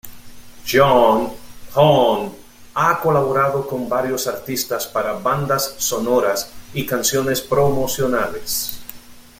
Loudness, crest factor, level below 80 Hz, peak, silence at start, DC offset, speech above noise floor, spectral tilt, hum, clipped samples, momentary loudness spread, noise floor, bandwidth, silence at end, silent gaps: -18 LUFS; 18 dB; -46 dBFS; -2 dBFS; 0.05 s; under 0.1%; 20 dB; -4 dB/octave; none; under 0.1%; 12 LU; -38 dBFS; 16.5 kHz; 0.2 s; none